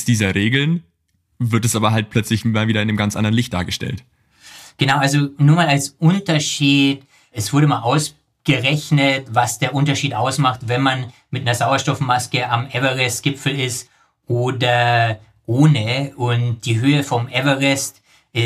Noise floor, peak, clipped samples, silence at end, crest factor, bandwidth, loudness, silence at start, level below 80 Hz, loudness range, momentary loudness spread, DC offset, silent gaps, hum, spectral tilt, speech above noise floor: -66 dBFS; -2 dBFS; under 0.1%; 0 s; 16 dB; 15 kHz; -18 LUFS; 0 s; -54 dBFS; 3 LU; 9 LU; under 0.1%; none; none; -5 dB/octave; 49 dB